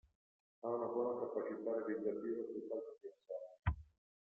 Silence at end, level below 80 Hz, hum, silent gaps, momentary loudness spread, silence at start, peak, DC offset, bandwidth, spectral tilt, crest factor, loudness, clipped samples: 0.55 s; -58 dBFS; none; none; 10 LU; 0.65 s; -24 dBFS; under 0.1%; 3.9 kHz; -8.5 dB/octave; 18 dB; -43 LUFS; under 0.1%